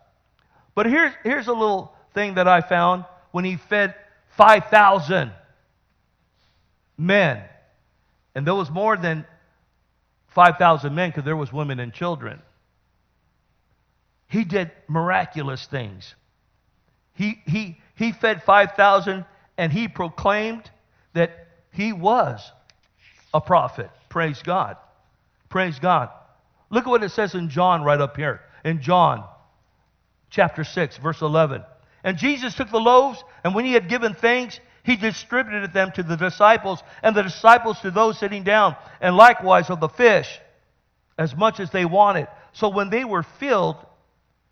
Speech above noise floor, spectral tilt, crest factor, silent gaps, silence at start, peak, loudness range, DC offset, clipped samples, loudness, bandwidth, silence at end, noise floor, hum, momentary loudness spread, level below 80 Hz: 47 dB; -6 dB/octave; 22 dB; none; 0.75 s; 0 dBFS; 10 LU; under 0.1%; under 0.1%; -20 LUFS; 10 kHz; 0.75 s; -66 dBFS; none; 14 LU; -58 dBFS